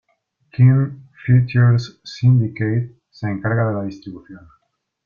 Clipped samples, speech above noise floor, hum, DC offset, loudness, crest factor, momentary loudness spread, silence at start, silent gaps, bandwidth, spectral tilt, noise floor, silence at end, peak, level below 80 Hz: under 0.1%; 52 dB; none; under 0.1%; -18 LUFS; 16 dB; 18 LU; 0.6 s; none; 6.8 kHz; -8.5 dB/octave; -68 dBFS; 0.7 s; -4 dBFS; -52 dBFS